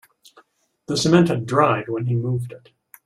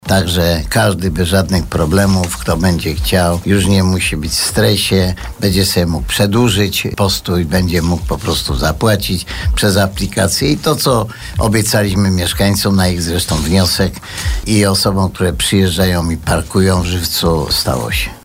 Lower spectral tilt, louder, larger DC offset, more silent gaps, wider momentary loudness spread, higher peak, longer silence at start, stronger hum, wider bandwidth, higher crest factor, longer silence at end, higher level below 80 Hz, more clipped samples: first, -6 dB/octave vs -4.5 dB/octave; second, -20 LUFS vs -14 LUFS; neither; neither; first, 10 LU vs 5 LU; about the same, -2 dBFS vs -2 dBFS; first, 0.9 s vs 0.05 s; neither; second, 14 kHz vs 16.5 kHz; first, 18 dB vs 12 dB; first, 0.45 s vs 0.05 s; second, -56 dBFS vs -26 dBFS; neither